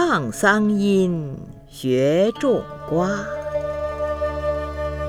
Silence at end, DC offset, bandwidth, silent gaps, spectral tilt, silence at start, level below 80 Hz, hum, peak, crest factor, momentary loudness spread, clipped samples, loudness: 0 s; under 0.1%; 15.5 kHz; none; -6 dB/octave; 0 s; -40 dBFS; 50 Hz at -50 dBFS; -4 dBFS; 18 dB; 10 LU; under 0.1%; -21 LUFS